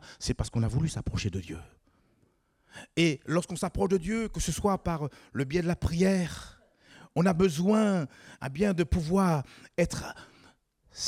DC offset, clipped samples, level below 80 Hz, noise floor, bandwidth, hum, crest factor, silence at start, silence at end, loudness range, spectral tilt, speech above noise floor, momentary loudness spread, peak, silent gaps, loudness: under 0.1%; under 0.1%; -46 dBFS; -69 dBFS; 15 kHz; none; 18 dB; 0.05 s; 0 s; 4 LU; -6 dB/octave; 41 dB; 15 LU; -12 dBFS; none; -29 LUFS